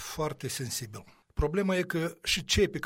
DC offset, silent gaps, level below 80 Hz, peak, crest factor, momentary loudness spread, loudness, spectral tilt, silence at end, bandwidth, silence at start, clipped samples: under 0.1%; none; -42 dBFS; -12 dBFS; 18 dB; 12 LU; -30 LUFS; -4 dB/octave; 0 s; 16.5 kHz; 0 s; under 0.1%